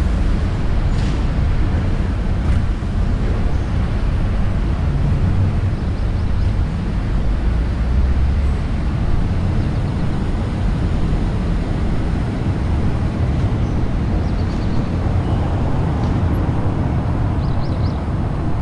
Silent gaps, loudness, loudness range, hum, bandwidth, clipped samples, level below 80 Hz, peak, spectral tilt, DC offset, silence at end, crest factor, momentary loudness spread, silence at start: none; -20 LUFS; 1 LU; none; 10.5 kHz; under 0.1%; -20 dBFS; -6 dBFS; -8 dB/octave; under 0.1%; 0 s; 12 dB; 3 LU; 0 s